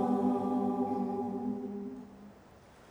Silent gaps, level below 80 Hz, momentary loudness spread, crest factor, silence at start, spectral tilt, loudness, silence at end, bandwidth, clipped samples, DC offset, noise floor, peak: none; -70 dBFS; 21 LU; 16 dB; 0 s; -9 dB/octave; -34 LUFS; 0.05 s; 8 kHz; under 0.1%; under 0.1%; -57 dBFS; -18 dBFS